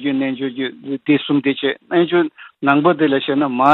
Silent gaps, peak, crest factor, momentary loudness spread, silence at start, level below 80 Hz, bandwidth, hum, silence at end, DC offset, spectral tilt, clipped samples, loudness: none; 0 dBFS; 16 dB; 9 LU; 0 s; -66 dBFS; 4.3 kHz; none; 0 s; under 0.1%; -8 dB/octave; under 0.1%; -18 LUFS